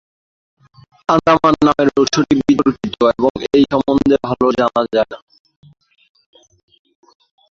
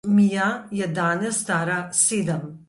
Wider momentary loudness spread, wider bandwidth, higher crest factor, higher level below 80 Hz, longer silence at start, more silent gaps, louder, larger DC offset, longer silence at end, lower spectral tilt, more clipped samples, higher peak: about the same, 6 LU vs 8 LU; second, 7.4 kHz vs 11.5 kHz; about the same, 16 dB vs 18 dB; first, -46 dBFS vs -64 dBFS; first, 1.1 s vs 0.05 s; first, 3.30-3.35 s vs none; first, -15 LUFS vs -22 LUFS; neither; first, 2.4 s vs 0.1 s; about the same, -5.5 dB/octave vs -4.5 dB/octave; neither; about the same, -2 dBFS vs -4 dBFS